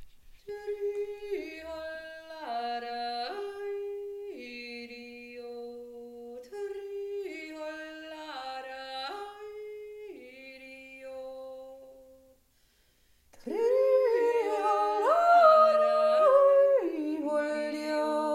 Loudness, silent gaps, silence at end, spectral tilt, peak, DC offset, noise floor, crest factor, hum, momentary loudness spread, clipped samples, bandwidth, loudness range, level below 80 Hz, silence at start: -28 LUFS; none; 0 s; -3.5 dB/octave; -10 dBFS; under 0.1%; -67 dBFS; 20 dB; none; 23 LU; under 0.1%; 14 kHz; 20 LU; -68 dBFS; 0 s